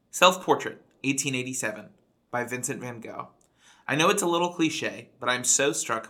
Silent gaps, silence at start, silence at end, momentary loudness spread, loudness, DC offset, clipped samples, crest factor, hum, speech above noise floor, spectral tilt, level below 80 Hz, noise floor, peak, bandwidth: none; 0.15 s; 0 s; 16 LU; -25 LUFS; under 0.1%; under 0.1%; 24 dB; none; 33 dB; -2.5 dB/octave; -76 dBFS; -59 dBFS; -4 dBFS; 18.5 kHz